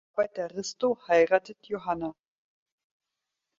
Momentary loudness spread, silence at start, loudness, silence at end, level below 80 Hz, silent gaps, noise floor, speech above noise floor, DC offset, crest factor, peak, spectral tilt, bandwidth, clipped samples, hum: 13 LU; 0.15 s; -28 LUFS; 1.45 s; -68 dBFS; none; -86 dBFS; 59 dB; under 0.1%; 20 dB; -8 dBFS; -4 dB/octave; 7.6 kHz; under 0.1%; none